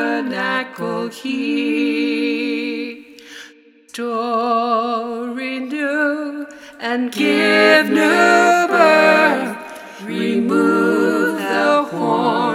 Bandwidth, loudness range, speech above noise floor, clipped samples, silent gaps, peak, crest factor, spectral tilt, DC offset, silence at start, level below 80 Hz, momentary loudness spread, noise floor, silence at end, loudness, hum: 16 kHz; 8 LU; 31 dB; under 0.1%; none; 0 dBFS; 16 dB; -4.5 dB/octave; under 0.1%; 0 s; -66 dBFS; 16 LU; -46 dBFS; 0 s; -16 LUFS; none